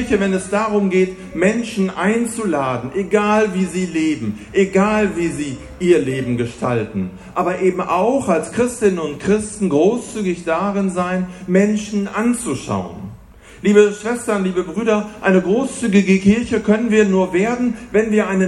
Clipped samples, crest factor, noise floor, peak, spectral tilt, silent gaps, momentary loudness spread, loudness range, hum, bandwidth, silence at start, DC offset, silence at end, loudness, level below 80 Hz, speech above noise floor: under 0.1%; 16 dB; -41 dBFS; 0 dBFS; -6 dB/octave; none; 8 LU; 3 LU; none; 12 kHz; 0 s; under 0.1%; 0 s; -18 LUFS; -46 dBFS; 24 dB